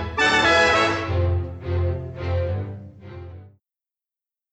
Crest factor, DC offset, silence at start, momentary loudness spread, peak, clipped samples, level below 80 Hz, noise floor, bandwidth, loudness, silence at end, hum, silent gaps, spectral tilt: 18 dB; under 0.1%; 0 s; 24 LU; -6 dBFS; under 0.1%; -38 dBFS; under -90 dBFS; 8.6 kHz; -21 LUFS; 1.05 s; none; none; -4.5 dB/octave